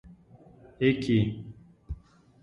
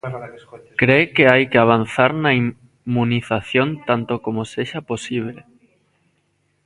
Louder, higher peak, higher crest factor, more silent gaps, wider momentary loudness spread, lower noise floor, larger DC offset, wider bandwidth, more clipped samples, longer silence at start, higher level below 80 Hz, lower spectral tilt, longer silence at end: second, -27 LUFS vs -18 LUFS; second, -10 dBFS vs 0 dBFS; about the same, 20 dB vs 20 dB; neither; first, 19 LU vs 14 LU; second, -54 dBFS vs -66 dBFS; neither; about the same, 10.5 kHz vs 11.5 kHz; neither; about the same, 0.05 s vs 0.05 s; first, -48 dBFS vs -54 dBFS; first, -8 dB/octave vs -6.5 dB/octave; second, 0.5 s vs 1.25 s